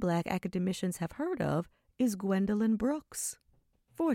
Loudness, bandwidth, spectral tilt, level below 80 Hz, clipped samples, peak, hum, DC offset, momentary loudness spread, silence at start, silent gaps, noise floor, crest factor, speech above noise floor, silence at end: -33 LUFS; 16.5 kHz; -6 dB/octave; -60 dBFS; under 0.1%; -16 dBFS; none; under 0.1%; 7 LU; 0 s; none; -69 dBFS; 18 dB; 38 dB; 0 s